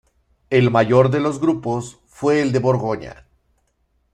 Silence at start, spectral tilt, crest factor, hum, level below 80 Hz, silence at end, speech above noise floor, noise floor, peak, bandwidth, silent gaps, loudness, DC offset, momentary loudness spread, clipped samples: 0.5 s; -7 dB/octave; 18 dB; none; -54 dBFS; 1 s; 48 dB; -66 dBFS; -2 dBFS; 10.5 kHz; none; -18 LUFS; under 0.1%; 12 LU; under 0.1%